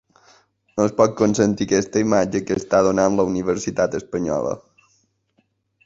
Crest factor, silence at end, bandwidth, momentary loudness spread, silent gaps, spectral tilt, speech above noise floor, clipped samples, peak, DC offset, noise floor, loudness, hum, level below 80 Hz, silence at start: 20 dB; 1.25 s; 8 kHz; 7 LU; none; -5.5 dB/octave; 47 dB; under 0.1%; -2 dBFS; under 0.1%; -66 dBFS; -20 LUFS; none; -50 dBFS; 0.75 s